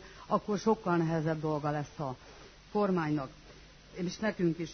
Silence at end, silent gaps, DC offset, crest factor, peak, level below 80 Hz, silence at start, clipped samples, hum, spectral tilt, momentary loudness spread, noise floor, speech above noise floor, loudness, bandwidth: 0 s; none; under 0.1%; 18 dB; -14 dBFS; -60 dBFS; 0 s; under 0.1%; none; -6.5 dB/octave; 15 LU; -54 dBFS; 22 dB; -33 LUFS; 6.4 kHz